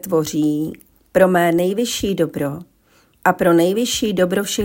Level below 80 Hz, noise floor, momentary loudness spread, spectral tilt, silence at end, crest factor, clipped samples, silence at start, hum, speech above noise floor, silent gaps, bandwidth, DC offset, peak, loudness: -50 dBFS; -56 dBFS; 10 LU; -4.5 dB/octave; 0 s; 18 dB; under 0.1%; 0.05 s; none; 39 dB; none; 17 kHz; under 0.1%; 0 dBFS; -18 LUFS